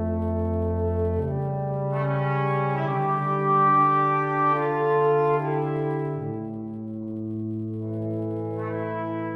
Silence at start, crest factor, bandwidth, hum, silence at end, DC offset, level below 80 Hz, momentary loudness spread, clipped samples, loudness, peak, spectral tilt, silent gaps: 0 s; 14 dB; 4.9 kHz; none; 0 s; under 0.1%; -46 dBFS; 11 LU; under 0.1%; -25 LUFS; -10 dBFS; -10 dB/octave; none